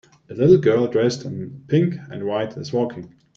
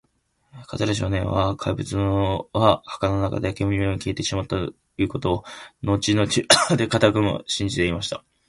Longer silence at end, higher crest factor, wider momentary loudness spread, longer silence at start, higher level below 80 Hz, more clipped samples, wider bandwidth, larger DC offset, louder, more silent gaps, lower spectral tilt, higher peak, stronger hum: about the same, 0.3 s vs 0.3 s; about the same, 18 dB vs 22 dB; first, 16 LU vs 10 LU; second, 0.3 s vs 0.55 s; second, -58 dBFS vs -42 dBFS; neither; second, 7.6 kHz vs 11.5 kHz; neither; about the same, -20 LUFS vs -22 LUFS; neither; first, -7.5 dB/octave vs -4.5 dB/octave; about the same, -2 dBFS vs 0 dBFS; neither